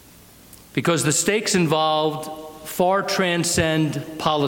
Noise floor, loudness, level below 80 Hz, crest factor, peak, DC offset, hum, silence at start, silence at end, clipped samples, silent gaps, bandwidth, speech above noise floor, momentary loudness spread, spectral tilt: -48 dBFS; -20 LUFS; -52 dBFS; 16 dB; -6 dBFS; under 0.1%; none; 0.75 s; 0 s; under 0.1%; none; 17 kHz; 27 dB; 11 LU; -4 dB/octave